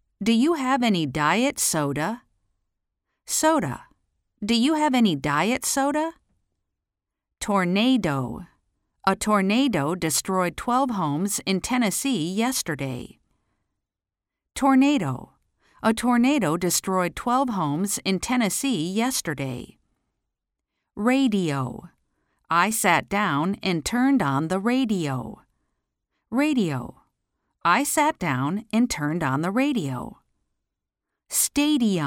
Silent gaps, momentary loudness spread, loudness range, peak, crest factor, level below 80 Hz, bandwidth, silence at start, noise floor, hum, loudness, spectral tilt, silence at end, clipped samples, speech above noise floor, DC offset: none; 10 LU; 4 LU; -6 dBFS; 18 dB; -54 dBFS; 17 kHz; 0.2 s; -88 dBFS; none; -23 LUFS; -4 dB/octave; 0 s; under 0.1%; 65 dB; under 0.1%